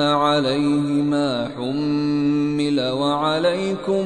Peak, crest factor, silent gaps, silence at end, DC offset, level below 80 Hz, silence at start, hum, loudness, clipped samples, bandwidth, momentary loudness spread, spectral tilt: -6 dBFS; 14 dB; none; 0 s; under 0.1%; -54 dBFS; 0 s; none; -20 LUFS; under 0.1%; 10.5 kHz; 5 LU; -6 dB/octave